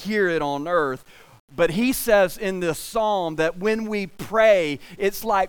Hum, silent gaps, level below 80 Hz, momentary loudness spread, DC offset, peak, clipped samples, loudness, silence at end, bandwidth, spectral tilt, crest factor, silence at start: none; 1.40-1.48 s; -48 dBFS; 10 LU; under 0.1%; -4 dBFS; under 0.1%; -22 LUFS; 0 s; 19.5 kHz; -4.5 dB/octave; 18 dB; 0 s